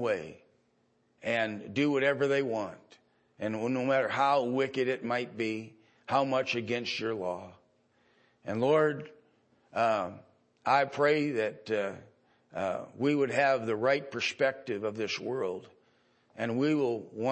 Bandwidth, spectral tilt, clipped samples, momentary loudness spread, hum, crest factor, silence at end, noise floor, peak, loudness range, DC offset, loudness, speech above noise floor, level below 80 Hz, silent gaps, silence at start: 8.8 kHz; -5.5 dB/octave; under 0.1%; 12 LU; none; 18 dB; 0 s; -71 dBFS; -12 dBFS; 3 LU; under 0.1%; -30 LUFS; 41 dB; -78 dBFS; none; 0 s